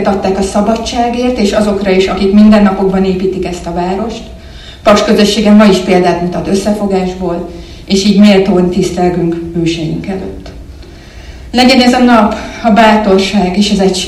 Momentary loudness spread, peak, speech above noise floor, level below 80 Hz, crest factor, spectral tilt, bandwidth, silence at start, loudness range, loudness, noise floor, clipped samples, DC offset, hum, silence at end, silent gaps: 13 LU; 0 dBFS; 21 dB; -30 dBFS; 10 dB; -5.5 dB/octave; 12.5 kHz; 0 s; 2 LU; -9 LUFS; -30 dBFS; 1%; under 0.1%; none; 0 s; none